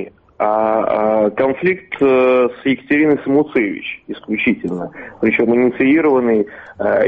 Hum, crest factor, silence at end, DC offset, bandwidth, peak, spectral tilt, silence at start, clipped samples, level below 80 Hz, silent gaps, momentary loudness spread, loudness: none; 12 dB; 0 s; under 0.1%; 5 kHz; -4 dBFS; -8.5 dB/octave; 0 s; under 0.1%; -54 dBFS; none; 12 LU; -16 LUFS